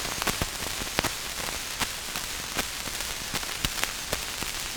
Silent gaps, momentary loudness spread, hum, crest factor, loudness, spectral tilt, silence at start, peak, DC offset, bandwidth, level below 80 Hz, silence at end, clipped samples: none; 3 LU; none; 32 dB; -29 LUFS; -1.5 dB/octave; 0 s; 0 dBFS; under 0.1%; over 20 kHz; -44 dBFS; 0 s; under 0.1%